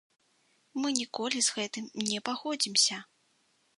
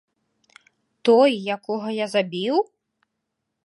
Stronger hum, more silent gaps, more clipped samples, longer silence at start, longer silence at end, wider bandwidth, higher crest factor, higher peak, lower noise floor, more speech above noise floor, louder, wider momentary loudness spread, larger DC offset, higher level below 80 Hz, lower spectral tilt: neither; neither; neither; second, 0.75 s vs 1.05 s; second, 0.75 s vs 1.05 s; about the same, 11.5 kHz vs 11.5 kHz; first, 28 dB vs 18 dB; about the same, -6 dBFS vs -4 dBFS; second, -71 dBFS vs -79 dBFS; second, 40 dB vs 59 dB; second, -29 LUFS vs -21 LUFS; about the same, 11 LU vs 11 LU; neither; about the same, -82 dBFS vs -80 dBFS; second, -1 dB/octave vs -5.5 dB/octave